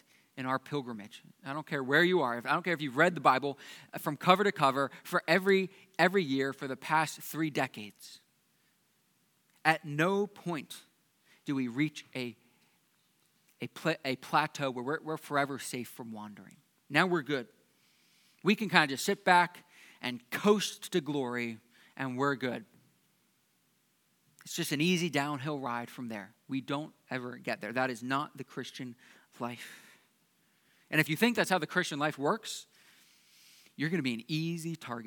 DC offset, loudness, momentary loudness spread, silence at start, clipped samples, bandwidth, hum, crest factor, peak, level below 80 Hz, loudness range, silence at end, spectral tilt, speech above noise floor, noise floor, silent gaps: under 0.1%; -32 LUFS; 17 LU; 0.35 s; under 0.1%; 19 kHz; none; 28 dB; -4 dBFS; -90 dBFS; 9 LU; 0 s; -4.5 dB/octave; 41 dB; -73 dBFS; none